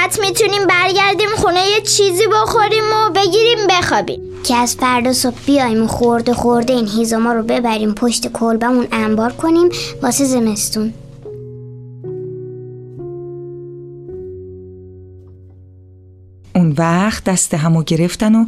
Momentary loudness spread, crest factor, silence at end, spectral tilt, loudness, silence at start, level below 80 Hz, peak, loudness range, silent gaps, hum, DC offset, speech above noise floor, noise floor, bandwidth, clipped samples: 20 LU; 14 dB; 0 s; -4 dB/octave; -14 LUFS; 0 s; -42 dBFS; -2 dBFS; 18 LU; none; none; under 0.1%; 28 dB; -41 dBFS; 15.5 kHz; under 0.1%